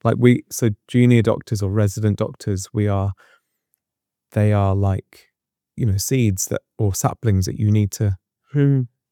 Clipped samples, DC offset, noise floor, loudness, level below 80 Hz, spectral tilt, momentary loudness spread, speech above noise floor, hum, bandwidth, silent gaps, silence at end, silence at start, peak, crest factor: under 0.1%; under 0.1%; -84 dBFS; -20 LUFS; -54 dBFS; -6.5 dB/octave; 9 LU; 66 dB; none; 18 kHz; none; 0.25 s; 0.05 s; -2 dBFS; 18 dB